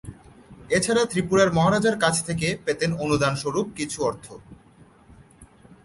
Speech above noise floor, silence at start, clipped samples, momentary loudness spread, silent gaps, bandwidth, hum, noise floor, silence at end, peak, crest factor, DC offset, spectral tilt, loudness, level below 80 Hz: 30 dB; 0.05 s; under 0.1%; 9 LU; none; 11.5 kHz; none; -53 dBFS; 0.4 s; -4 dBFS; 20 dB; under 0.1%; -4.5 dB/octave; -23 LUFS; -50 dBFS